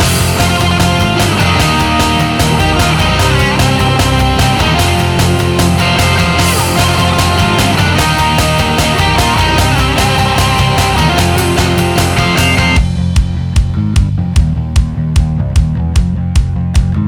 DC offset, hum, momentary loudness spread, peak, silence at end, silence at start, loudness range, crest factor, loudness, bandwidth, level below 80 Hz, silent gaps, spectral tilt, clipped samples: under 0.1%; none; 4 LU; 0 dBFS; 0 s; 0 s; 3 LU; 10 dB; -11 LUFS; 19.5 kHz; -18 dBFS; none; -4.5 dB/octave; under 0.1%